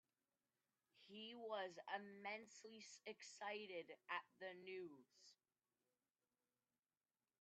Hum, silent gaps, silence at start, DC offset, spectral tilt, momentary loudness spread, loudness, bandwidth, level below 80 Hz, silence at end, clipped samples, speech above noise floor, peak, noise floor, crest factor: none; none; 0.95 s; under 0.1%; -2.5 dB/octave; 10 LU; -54 LUFS; 8.4 kHz; under -90 dBFS; 2.05 s; under 0.1%; over 36 dB; -34 dBFS; under -90 dBFS; 24 dB